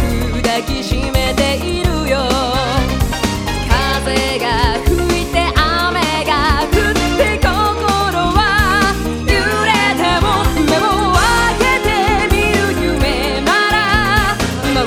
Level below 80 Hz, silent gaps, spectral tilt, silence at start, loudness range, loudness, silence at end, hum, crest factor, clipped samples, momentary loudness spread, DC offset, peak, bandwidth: -22 dBFS; none; -4.5 dB/octave; 0 s; 3 LU; -14 LUFS; 0 s; none; 14 dB; under 0.1%; 5 LU; under 0.1%; 0 dBFS; 17 kHz